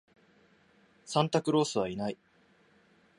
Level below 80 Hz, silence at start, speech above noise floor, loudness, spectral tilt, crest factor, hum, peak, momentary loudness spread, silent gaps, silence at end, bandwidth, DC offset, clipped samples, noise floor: -70 dBFS; 1.05 s; 36 dB; -30 LUFS; -5.5 dB/octave; 24 dB; none; -10 dBFS; 10 LU; none; 1.05 s; 11.5 kHz; under 0.1%; under 0.1%; -65 dBFS